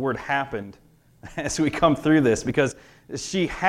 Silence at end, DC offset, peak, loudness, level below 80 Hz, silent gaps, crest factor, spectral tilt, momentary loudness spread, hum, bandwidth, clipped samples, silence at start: 0 s; under 0.1%; -4 dBFS; -23 LUFS; -48 dBFS; none; 20 dB; -5 dB/octave; 17 LU; none; 13 kHz; under 0.1%; 0 s